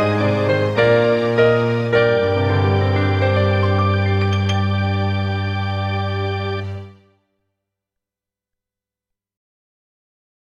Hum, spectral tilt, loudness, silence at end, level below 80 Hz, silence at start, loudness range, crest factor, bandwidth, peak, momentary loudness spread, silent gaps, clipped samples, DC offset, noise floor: 60 Hz at -70 dBFS; -7.5 dB/octave; -18 LUFS; 3.65 s; -54 dBFS; 0 s; 12 LU; 18 dB; 6.8 kHz; 0 dBFS; 7 LU; none; under 0.1%; under 0.1%; -87 dBFS